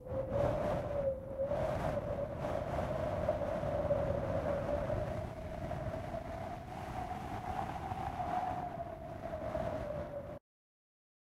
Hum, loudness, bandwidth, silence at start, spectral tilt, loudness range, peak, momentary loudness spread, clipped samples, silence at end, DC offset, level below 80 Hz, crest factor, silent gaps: none; -38 LUFS; 15 kHz; 0 s; -7.5 dB/octave; 5 LU; -22 dBFS; 9 LU; under 0.1%; 1 s; under 0.1%; -50 dBFS; 16 dB; none